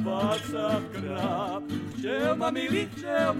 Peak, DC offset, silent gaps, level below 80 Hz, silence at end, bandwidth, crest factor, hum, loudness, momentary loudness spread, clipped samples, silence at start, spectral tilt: -12 dBFS; under 0.1%; none; -60 dBFS; 0 s; 16.5 kHz; 16 dB; none; -29 LUFS; 6 LU; under 0.1%; 0 s; -5.5 dB/octave